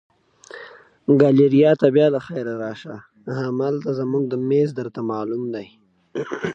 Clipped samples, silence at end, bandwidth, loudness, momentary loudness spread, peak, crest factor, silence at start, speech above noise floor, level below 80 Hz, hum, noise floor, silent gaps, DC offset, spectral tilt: under 0.1%; 0 s; 7.6 kHz; -20 LUFS; 21 LU; -2 dBFS; 18 dB; 0.55 s; 24 dB; -68 dBFS; none; -44 dBFS; none; under 0.1%; -8.5 dB/octave